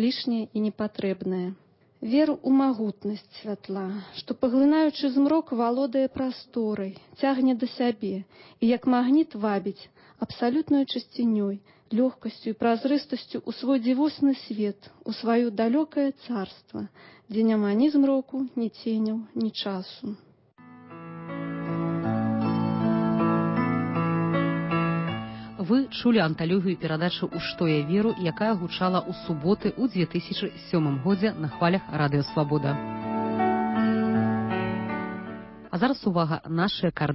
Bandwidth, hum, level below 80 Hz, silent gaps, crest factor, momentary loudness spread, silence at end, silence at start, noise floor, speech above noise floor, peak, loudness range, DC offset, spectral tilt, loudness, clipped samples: 5.8 kHz; none; -60 dBFS; none; 16 dB; 12 LU; 0 s; 0 s; -52 dBFS; 27 dB; -10 dBFS; 2 LU; under 0.1%; -11 dB/octave; -26 LUFS; under 0.1%